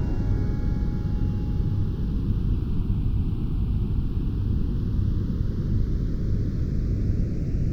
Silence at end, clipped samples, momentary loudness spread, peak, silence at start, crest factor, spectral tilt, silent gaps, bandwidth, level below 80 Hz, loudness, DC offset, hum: 0 s; under 0.1%; 1 LU; -12 dBFS; 0 s; 12 dB; -10 dB/octave; none; 6.2 kHz; -26 dBFS; -27 LUFS; under 0.1%; none